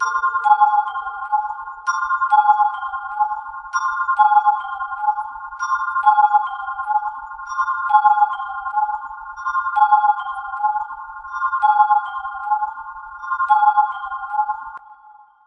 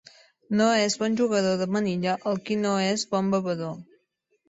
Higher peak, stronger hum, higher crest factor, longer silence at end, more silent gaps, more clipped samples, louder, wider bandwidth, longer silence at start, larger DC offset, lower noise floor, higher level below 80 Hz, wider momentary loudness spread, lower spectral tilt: first, -2 dBFS vs -8 dBFS; neither; about the same, 18 dB vs 18 dB; second, 0.35 s vs 0.65 s; neither; neither; first, -19 LUFS vs -25 LUFS; second, 6 kHz vs 8 kHz; second, 0 s vs 0.5 s; neither; second, -47 dBFS vs -71 dBFS; first, -58 dBFS vs -68 dBFS; first, 14 LU vs 8 LU; second, 1 dB/octave vs -5 dB/octave